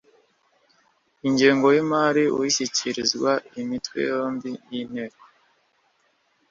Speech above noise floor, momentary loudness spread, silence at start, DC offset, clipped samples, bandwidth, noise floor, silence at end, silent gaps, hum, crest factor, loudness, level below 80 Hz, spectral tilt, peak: 44 dB; 14 LU; 1.25 s; under 0.1%; under 0.1%; 7.6 kHz; -67 dBFS; 1.4 s; none; none; 20 dB; -23 LUFS; -66 dBFS; -3.5 dB/octave; -4 dBFS